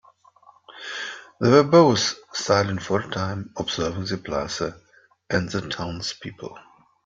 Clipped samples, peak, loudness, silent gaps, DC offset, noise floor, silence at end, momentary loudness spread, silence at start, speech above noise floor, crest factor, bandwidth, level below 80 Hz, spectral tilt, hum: under 0.1%; -2 dBFS; -23 LUFS; none; under 0.1%; -55 dBFS; 0.45 s; 18 LU; 0.7 s; 32 dB; 22 dB; 7.8 kHz; -54 dBFS; -5 dB/octave; none